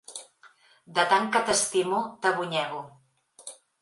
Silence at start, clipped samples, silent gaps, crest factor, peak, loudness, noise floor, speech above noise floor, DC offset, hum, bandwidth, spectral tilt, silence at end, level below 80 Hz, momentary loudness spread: 0.1 s; under 0.1%; none; 20 dB; -8 dBFS; -25 LUFS; -58 dBFS; 32 dB; under 0.1%; none; 11.5 kHz; -2 dB/octave; 0.25 s; -70 dBFS; 21 LU